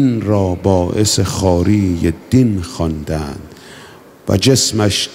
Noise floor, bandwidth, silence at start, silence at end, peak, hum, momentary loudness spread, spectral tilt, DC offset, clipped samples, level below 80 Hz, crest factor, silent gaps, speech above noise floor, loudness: -39 dBFS; 16 kHz; 0 s; 0 s; 0 dBFS; none; 10 LU; -5 dB/octave; under 0.1%; under 0.1%; -34 dBFS; 14 dB; none; 25 dB; -15 LUFS